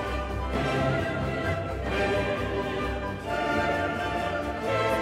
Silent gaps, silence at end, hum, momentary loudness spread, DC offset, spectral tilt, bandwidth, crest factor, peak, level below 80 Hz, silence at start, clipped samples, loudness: none; 0 s; none; 5 LU; under 0.1%; -6 dB/octave; 16 kHz; 16 dB; -12 dBFS; -38 dBFS; 0 s; under 0.1%; -28 LUFS